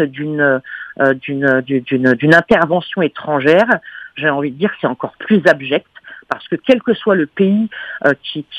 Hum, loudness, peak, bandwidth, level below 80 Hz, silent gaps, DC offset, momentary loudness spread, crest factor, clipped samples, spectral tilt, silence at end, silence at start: none; -15 LUFS; 0 dBFS; 10.5 kHz; -56 dBFS; none; under 0.1%; 9 LU; 14 dB; under 0.1%; -7 dB/octave; 0 s; 0 s